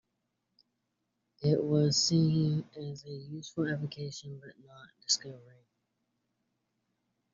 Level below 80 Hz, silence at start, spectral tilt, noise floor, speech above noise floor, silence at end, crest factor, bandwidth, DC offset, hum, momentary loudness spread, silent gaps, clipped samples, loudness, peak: -70 dBFS; 1.4 s; -6 dB/octave; -82 dBFS; 51 dB; 1.9 s; 20 dB; 7.6 kHz; under 0.1%; none; 19 LU; none; under 0.1%; -30 LUFS; -14 dBFS